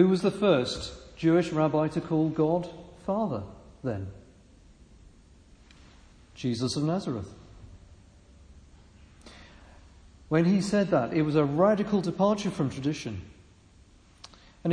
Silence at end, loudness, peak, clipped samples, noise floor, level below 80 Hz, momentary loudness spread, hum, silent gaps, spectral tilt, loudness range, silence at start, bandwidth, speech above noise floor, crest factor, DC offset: 0 s; -27 LUFS; -10 dBFS; under 0.1%; -56 dBFS; -54 dBFS; 14 LU; none; none; -7 dB/octave; 11 LU; 0 s; 10.5 kHz; 30 dB; 20 dB; under 0.1%